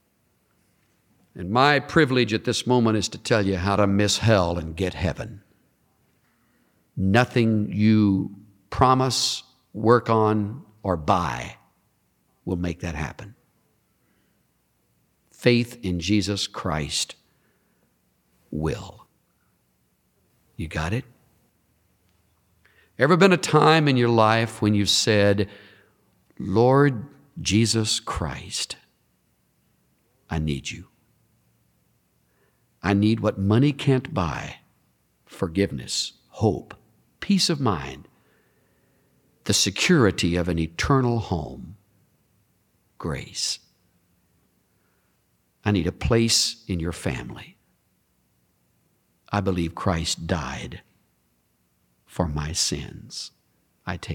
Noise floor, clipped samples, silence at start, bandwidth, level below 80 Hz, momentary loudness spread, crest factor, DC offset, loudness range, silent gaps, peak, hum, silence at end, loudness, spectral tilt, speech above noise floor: -68 dBFS; under 0.1%; 1.35 s; 17.5 kHz; -46 dBFS; 17 LU; 22 dB; under 0.1%; 14 LU; none; -4 dBFS; none; 0 s; -23 LUFS; -5 dB/octave; 46 dB